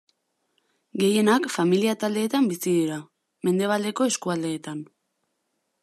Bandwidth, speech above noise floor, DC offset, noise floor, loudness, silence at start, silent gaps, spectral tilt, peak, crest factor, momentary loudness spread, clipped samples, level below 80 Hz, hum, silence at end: 14 kHz; 53 dB; under 0.1%; -76 dBFS; -24 LUFS; 0.95 s; none; -5 dB/octave; -8 dBFS; 18 dB; 12 LU; under 0.1%; -76 dBFS; none; 1 s